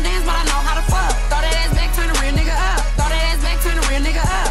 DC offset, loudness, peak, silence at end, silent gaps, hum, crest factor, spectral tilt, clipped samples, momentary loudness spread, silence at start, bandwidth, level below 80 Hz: under 0.1%; -19 LUFS; -2 dBFS; 0 s; none; none; 12 dB; -3.5 dB/octave; under 0.1%; 1 LU; 0 s; 15 kHz; -16 dBFS